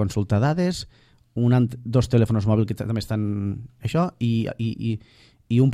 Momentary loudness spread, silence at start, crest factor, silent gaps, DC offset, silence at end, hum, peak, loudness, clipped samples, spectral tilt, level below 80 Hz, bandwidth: 10 LU; 0 s; 18 dB; none; under 0.1%; 0 s; none; -6 dBFS; -23 LUFS; under 0.1%; -7.5 dB/octave; -48 dBFS; 12.5 kHz